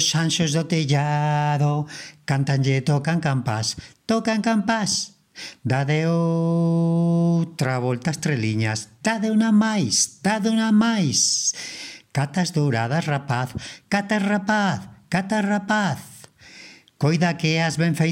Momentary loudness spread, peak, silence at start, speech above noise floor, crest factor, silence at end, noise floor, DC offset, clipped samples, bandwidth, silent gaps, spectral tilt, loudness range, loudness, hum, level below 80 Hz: 9 LU; -6 dBFS; 0 s; 25 dB; 16 dB; 0 s; -46 dBFS; under 0.1%; under 0.1%; 15 kHz; none; -4.5 dB/octave; 4 LU; -22 LUFS; none; -60 dBFS